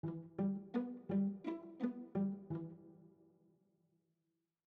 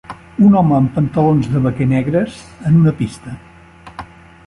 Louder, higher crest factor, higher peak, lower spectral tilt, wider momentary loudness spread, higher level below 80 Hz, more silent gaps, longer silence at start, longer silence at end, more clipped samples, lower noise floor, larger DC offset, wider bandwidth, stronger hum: second, -42 LUFS vs -14 LUFS; about the same, 18 dB vs 14 dB; second, -26 dBFS vs -2 dBFS; about the same, -9.5 dB/octave vs -9 dB/octave; second, 9 LU vs 22 LU; second, -82 dBFS vs -42 dBFS; neither; about the same, 0.05 s vs 0.1 s; first, 1.55 s vs 0.4 s; neither; first, -87 dBFS vs -40 dBFS; neither; second, 4.5 kHz vs 11.5 kHz; neither